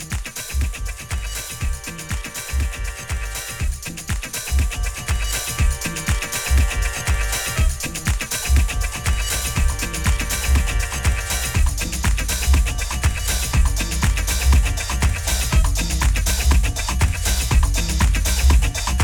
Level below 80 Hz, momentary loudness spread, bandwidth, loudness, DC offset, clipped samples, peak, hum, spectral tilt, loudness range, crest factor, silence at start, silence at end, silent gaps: -20 dBFS; 8 LU; 19 kHz; -21 LUFS; under 0.1%; under 0.1%; -2 dBFS; none; -3.5 dB/octave; 6 LU; 16 dB; 0 s; 0 s; none